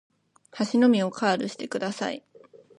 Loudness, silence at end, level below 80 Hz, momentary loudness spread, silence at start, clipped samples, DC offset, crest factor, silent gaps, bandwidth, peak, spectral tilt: -25 LUFS; 0.6 s; -76 dBFS; 11 LU; 0.55 s; under 0.1%; under 0.1%; 18 dB; none; 10.5 kHz; -8 dBFS; -5 dB/octave